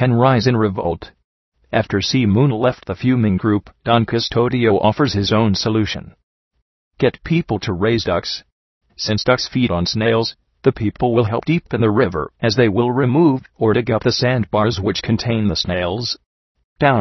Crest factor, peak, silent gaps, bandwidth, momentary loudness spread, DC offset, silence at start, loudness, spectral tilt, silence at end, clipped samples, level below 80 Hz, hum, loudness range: 16 dB; 0 dBFS; 1.24-1.52 s, 6.23-6.51 s, 6.62-6.91 s, 8.52-8.81 s, 16.26-16.55 s, 16.64-16.76 s; 6.2 kHz; 6 LU; under 0.1%; 0 s; -17 LUFS; -6.5 dB/octave; 0 s; under 0.1%; -44 dBFS; none; 3 LU